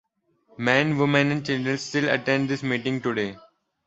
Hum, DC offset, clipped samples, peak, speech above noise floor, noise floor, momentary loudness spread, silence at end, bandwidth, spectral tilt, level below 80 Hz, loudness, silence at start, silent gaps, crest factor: none; under 0.1%; under 0.1%; -2 dBFS; 40 dB; -64 dBFS; 7 LU; 0.5 s; 8.2 kHz; -5.5 dB/octave; -62 dBFS; -24 LUFS; 0.6 s; none; 22 dB